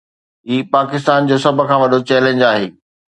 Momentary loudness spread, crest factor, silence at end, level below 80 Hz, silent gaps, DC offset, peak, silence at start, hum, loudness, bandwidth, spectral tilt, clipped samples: 7 LU; 14 dB; 0.4 s; -60 dBFS; none; under 0.1%; 0 dBFS; 0.45 s; none; -14 LUFS; 11 kHz; -6 dB/octave; under 0.1%